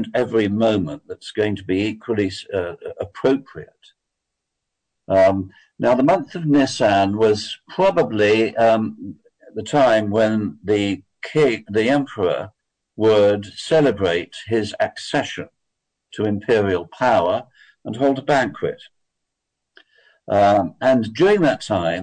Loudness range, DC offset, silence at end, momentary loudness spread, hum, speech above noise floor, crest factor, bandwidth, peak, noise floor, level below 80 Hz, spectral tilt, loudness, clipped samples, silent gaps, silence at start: 5 LU; under 0.1%; 0 s; 13 LU; none; 61 dB; 12 dB; 9.4 kHz; -8 dBFS; -80 dBFS; -56 dBFS; -6 dB/octave; -19 LUFS; under 0.1%; none; 0 s